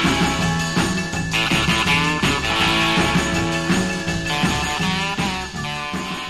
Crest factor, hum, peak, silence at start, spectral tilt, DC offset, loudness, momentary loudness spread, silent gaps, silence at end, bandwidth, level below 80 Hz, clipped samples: 14 dB; none; -6 dBFS; 0 s; -4 dB/octave; 0.5%; -19 LUFS; 7 LU; none; 0 s; 13 kHz; -36 dBFS; under 0.1%